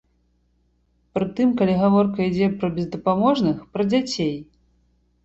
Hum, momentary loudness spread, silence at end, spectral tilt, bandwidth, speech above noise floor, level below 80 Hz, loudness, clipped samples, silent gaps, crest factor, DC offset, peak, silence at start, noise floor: 60 Hz at -45 dBFS; 8 LU; 0.8 s; -7 dB/octave; 8 kHz; 44 dB; -54 dBFS; -21 LUFS; under 0.1%; none; 16 dB; under 0.1%; -6 dBFS; 1.15 s; -65 dBFS